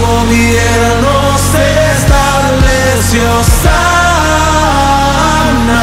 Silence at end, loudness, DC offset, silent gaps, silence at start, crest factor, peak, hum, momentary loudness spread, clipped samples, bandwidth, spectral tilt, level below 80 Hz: 0 s; -9 LUFS; under 0.1%; none; 0 s; 8 dB; 0 dBFS; none; 1 LU; 0.3%; 16.5 kHz; -4.5 dB/octave; -16 dBFS